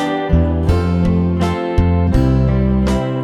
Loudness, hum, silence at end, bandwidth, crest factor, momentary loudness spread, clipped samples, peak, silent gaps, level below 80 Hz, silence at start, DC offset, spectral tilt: -15 LUFS; none; 0 s; 11 kHz; 12 dB; 3 LU; under 0.1%; -2 dBFS; none; -22 dBFS; 0 s; under 0.1%; -8.5 dB/octave